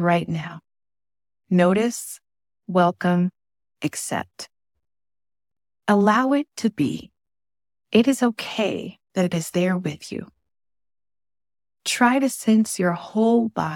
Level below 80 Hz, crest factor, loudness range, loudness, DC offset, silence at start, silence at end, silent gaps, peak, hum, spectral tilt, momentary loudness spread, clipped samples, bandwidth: -66 dBFS; 20 dB; 4 LU; -22 LUFS; under 0.1%; 0 s; 0 s; none; -4 dBFS; none; -5.5 dB/octave; 15 LU; under 0.1%; 17 kHz